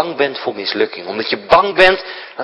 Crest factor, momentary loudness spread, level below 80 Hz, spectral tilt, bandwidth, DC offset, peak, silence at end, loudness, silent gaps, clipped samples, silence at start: 16 dB; 10 LU; -46 dBFS; -4.5 dB/octave; 11 kHz; under 0.1%; 0 dBFS; 0 s; -15 LUFS; none; 0.3%; 0 s